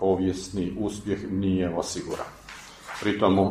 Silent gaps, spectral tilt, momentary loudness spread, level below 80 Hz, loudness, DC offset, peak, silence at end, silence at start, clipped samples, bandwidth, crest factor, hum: none; -6 dB/octave; 15 LU; -50 dBFS; -27 LUFS; under 0.1%; -6 dBFS; 0 s; 0 s; under 0.1%; 14.5 kHz; 20 dB; none